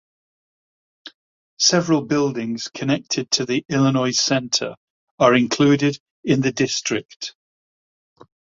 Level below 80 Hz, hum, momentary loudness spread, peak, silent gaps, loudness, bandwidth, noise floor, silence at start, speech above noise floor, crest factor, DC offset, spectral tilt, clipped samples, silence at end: -60 dBFS; none; 10 LU; -2 dBFS; 1.14-1.57 s, 4.77-5.18 s, 6.00-6.23 s, 7.05-7.09 s, 7.16-7.20 s; -19 LUFS; 7.6 kHz; under -90 dBFS; 1.05 s; over 71 dB; 20 dB; under 0.1%; -4 dB/octave; under 0.1%; 1.25 s